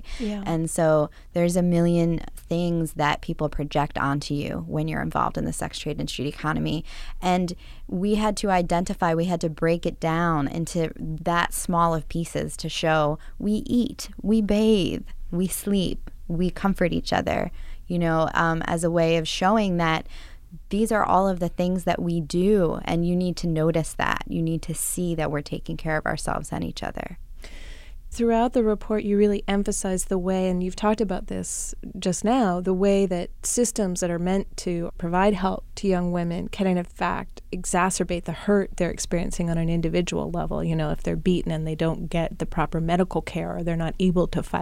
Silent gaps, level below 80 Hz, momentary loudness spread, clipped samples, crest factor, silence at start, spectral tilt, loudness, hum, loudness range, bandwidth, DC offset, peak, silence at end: none; -36 dBFS; 9 LU; under 0.1%; 20 dB; 0 s; -5.5 dB/octave; -25 LUFS; none; 4 LU; 15.5 kHz; under 0.1%; -4 dBFS; 0 s